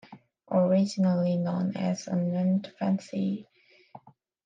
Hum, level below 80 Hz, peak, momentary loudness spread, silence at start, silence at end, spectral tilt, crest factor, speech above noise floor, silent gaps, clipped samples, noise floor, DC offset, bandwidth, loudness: none; -78 dBFS; -14 dBFS; 7 LU; 0.1 s; 0.5 s; -8 dB/octave; 14 dB; 26 dB; none; under 0.1%; -53 dBFS; under 0.1%; 7.6 kHz; -28 LUFS